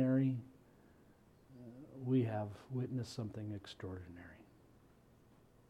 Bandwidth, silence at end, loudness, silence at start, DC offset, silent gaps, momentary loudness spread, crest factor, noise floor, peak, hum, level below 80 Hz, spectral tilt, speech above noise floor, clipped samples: 10.5 kHz; 1.3 s; -40 LUFS; 0 s; under 0.1%; none; 23 LU; 18 dB; -66 dBFS; -22 dBFS; none; -72 dBFS; -8 dB/octave; 22 dB; under 0.1%